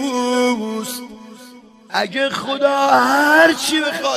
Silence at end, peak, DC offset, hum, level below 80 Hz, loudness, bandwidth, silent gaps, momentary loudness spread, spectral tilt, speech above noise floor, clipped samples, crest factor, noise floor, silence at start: 0 s; 0 dBFS; under 0.1%; none; -62 dBFS; -16 LUFS; 15 kHz; none; 13 LU; -2.5 dB/octave; 27 dB; under 0.1%; 16 dB; -42 dBFS; 0 s